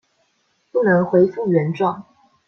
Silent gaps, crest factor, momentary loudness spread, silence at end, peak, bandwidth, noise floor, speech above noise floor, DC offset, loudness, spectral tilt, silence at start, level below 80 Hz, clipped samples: none; 16 dB; 9 LU; 0.45 s; -4 dBFS; 6.4 kHz; -66 dBFS; 49 dB; under 0.1%; -18 LUFS; -9.5 dB/octave; 0.75 s; -62 dBFS; under 0.1%